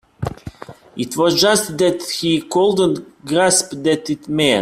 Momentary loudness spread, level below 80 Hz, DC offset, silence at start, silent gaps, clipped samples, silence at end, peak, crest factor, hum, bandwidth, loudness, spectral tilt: 14 LU; -50 dBFS; under 0.1%; 0.2 s; none; under 0.1%; 0 s; 0 dBFS; 18 dB; none; 16 kHz; -17 LUFS; -3.5 dB/octave